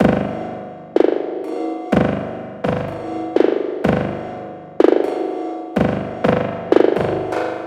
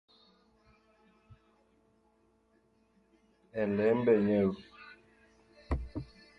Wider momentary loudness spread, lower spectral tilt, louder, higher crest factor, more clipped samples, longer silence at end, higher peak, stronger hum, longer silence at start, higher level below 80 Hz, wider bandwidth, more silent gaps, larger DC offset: second, 12 LU vs 24 LU; second, -8 dB/octave vs -9.5 dB/octave; first, -19 LUFS vs -31 LUFS; about the same, 18 dB vs 22 dB; neither; second, 0 s vs 0.35 s; first, 0 dBFS vs -14 dBFS; first, 50 Hz at -40 dBFS vs none; second, 0 s vs 3.55 s; first, -44 dBFS vs -50 dBFS; first, 11 kHz vs 5.8 kHz; neither; neither